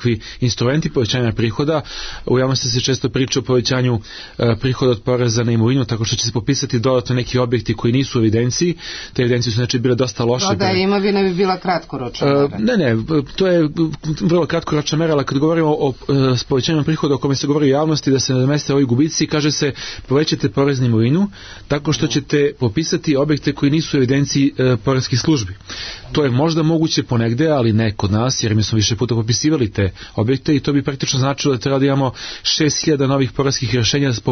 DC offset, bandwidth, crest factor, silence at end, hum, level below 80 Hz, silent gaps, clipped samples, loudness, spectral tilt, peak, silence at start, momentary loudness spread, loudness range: under 0.1%; 6.6 kHz; 12 dB; 0 s; none; -42 dBFS; none; under 0.1%; -17 LUFS; -5.5 dB/octave; -4 dBFS; 0 s; 5 LU; 1 LU